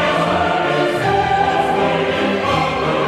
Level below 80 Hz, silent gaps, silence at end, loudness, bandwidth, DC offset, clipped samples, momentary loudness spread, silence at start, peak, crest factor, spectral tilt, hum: -44 dBFS; none; 0 s; -16 LUFS; 15 kHz; under 0.1%; under 0.1%; 2 LU; 0 s; -4 dBFS; 12 dB; -5.5 dB/octave; none